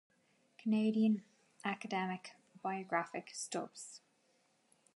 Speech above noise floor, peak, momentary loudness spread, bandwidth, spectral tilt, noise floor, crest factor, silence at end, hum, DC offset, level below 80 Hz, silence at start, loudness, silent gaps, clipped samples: 38 dB; -20 dBFS; 16 LU; 11.5 kHz; -5 dB/octave; -75 dBFS; 20 dB; 1 s; none; under 0.1%; under -90 dBFS; 0.6 s; -38 LUFS; none; under 0.1%